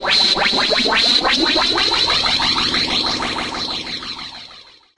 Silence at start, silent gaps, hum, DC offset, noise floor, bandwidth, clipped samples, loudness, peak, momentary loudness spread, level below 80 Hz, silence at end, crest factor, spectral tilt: 0 s; none; none; under 0.1%; -43 dBFS; 11.5 kHz; under 0.1%; -15 LUFS; -2 dBFS; 13 LU; -42 dBFS; 0.35 s; 16 dB; -1.5 dB/octave